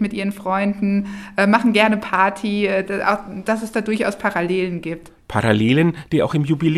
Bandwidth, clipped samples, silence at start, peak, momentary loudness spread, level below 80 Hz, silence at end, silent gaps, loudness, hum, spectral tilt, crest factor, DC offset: 13 kHz; under 0.1%; 0 s; 0 dBFS; 9 LU; -50 dBFS; 0 s; none; -19 LUFS; none; -6.5 dB/octave; 18 dB; under 0.1%